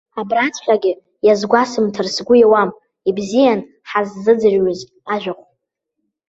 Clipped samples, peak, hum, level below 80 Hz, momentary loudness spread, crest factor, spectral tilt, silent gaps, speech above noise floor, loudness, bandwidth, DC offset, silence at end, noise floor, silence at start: under 0.1%; -2 dBFS; none; -58 dBFS; 10 LU; 16 dB; -5 dB/octave; none; 60 dB; -16 LUFS; 8 kHz; under 0.1%; 0.95 s; -75 dBFS; 0.15 s